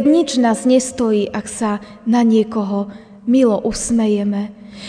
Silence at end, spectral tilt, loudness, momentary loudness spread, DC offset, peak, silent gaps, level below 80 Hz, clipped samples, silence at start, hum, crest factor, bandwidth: 0 s; -5 dB/octave; -17 LUFS; 10 LU; under 0.1%; -2 dBFS; none; -46 dBFS; under 0.1%; 0 s; none; 14 dB; 10 kHz